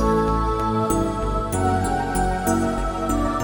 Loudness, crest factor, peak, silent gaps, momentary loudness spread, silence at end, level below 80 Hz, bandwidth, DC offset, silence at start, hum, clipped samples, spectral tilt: -22 LUFS; 14 dB; -8 dBFS; none; 3 LU; 0 s; -30 dBFS; 19 kHz; under 0.1%; 0 s; none; under 0.1%; -6 dB/octave